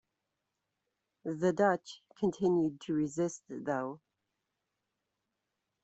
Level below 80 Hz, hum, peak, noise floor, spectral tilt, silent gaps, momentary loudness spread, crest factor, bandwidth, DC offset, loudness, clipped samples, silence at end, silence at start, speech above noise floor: -74 dBFS; none; -14 dBFS; -86 dBFS; -6.5 dB/octave; none; 13 LU; 22 dB; 8.2 kHz; under 0.1%; -33 LUFS; under 0.1%; 1.85 s; 1.25 s; 53 dB